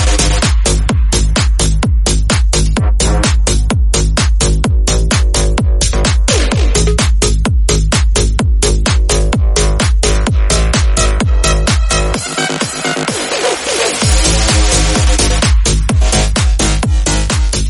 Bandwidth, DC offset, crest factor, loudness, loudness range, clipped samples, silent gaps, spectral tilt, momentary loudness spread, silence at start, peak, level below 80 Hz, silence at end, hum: 11.5 kHz; under 0.1%; 10 dB; -12 LUFS; 2 LU; under 0.1%; none; -4 dB/octave; 3 LU; 0 s; 0 dBFS; -12 dBFS; 0 s; none